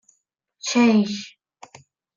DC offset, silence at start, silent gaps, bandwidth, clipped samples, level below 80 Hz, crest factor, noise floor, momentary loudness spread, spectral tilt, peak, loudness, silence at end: under 0.1%; 0.65 s; none; 7.6 kHz; under 0.1%; -70 dBFS; 16 dB; -71 dBFS; 17 LU; -4.5 dB/octave; -6 dBFS; -20 LUFS; 0.9 s